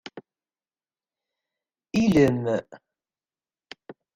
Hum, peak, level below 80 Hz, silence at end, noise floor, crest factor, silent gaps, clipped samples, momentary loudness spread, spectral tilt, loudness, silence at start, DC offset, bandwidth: none; -6 dBFS; -56 dBFS; 0.25 s; under -90 dBFS; 22 dB; none; under 0.1%; 25 LU; -7 dB/octave; -23 LUFS; 0.15 s; under 0.1%; 15.5 kHz